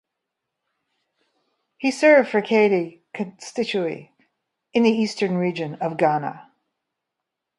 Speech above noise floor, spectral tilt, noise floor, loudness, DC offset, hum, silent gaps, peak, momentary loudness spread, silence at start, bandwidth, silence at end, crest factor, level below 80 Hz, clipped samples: 62 dB; -5.5 dB/octave; -83 dBFS; -21 LUFS; under 0.1%; none; none; -2 dBFS; 16 LU; 1.8 s; 11.5 kHz; 1.15 s; 20 dB; -72 dBFS; under 0.1%